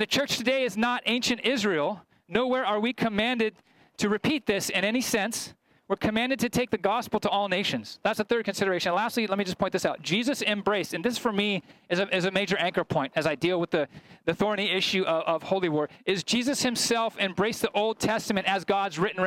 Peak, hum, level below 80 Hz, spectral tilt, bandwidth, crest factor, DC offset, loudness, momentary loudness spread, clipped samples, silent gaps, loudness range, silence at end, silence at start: -10 dBFS; none; -62 dBFS; -4 dB/octave; 16.5 kHz; 18 dB; under 0.1%; -27 LUFS; 4 LU; under 0.1%; none; 1 LU; 0 s; 0 s